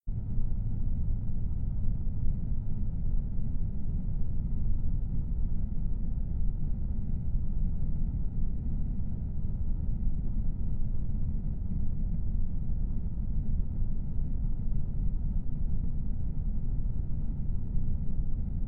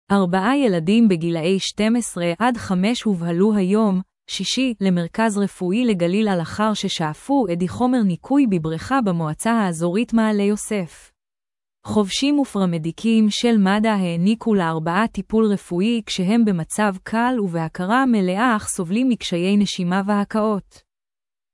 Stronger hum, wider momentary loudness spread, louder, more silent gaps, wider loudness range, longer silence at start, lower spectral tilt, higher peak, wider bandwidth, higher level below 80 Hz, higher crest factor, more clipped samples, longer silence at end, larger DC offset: neither; second, 2 LU vs 5 LU; second, -36 LUFS vs -20 LUFS; neither; about the same, 0 LU vs 2 LU; about the same, 0.05 s vs 0.1 s; first, -13.5 dB/octave vs -5.5 dB/octave; second, -16 dBFS vs -6 dBFS; second, 1.3 kHz vs 12 kHz; first, -30 dBFS vs -54 dBFS; about the same, 12 dB vs 14 dB; neither; second, 0 s vs 0.95 s; neither